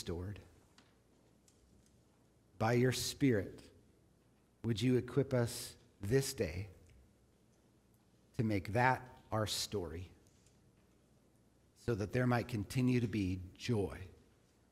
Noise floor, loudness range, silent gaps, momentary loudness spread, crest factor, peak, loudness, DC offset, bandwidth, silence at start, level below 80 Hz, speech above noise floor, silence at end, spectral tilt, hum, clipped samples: -70 dBFS; 4 LU; none; 16 LU; 24 dB; -16 dBFS; -37 LUFS; under 0.1%; 16 kHz; 0 s; -64 dBFS; 35 dB; 0.6 s; -5.5 dB/octave; none; under 0.1%